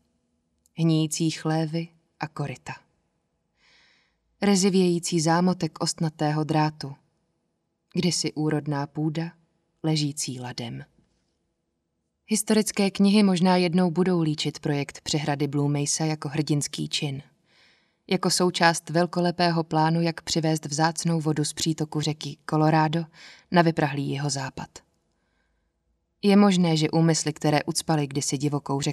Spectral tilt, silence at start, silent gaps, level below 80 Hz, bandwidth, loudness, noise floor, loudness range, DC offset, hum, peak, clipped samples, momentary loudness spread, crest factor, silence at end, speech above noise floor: -5 dB/octave; 0.75 s; none; -64 dBFS; 13.5 kHz; -24 LUFS; -77 dBFS; 6 LU; under 0.1%; none; -4 dBFS; under 0.1%; 13 LU; 20 dB; 0 s; 53 dB